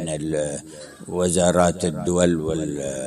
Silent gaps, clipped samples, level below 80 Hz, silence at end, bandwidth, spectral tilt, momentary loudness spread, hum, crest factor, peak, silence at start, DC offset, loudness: none; under 0.1%; -42 dBFS; 0 s; 13 kHz; -5 dB/octave; 14 LU; none; 18 dB; -4 dBFS; 0 s; under 0.1%; -22 LUFS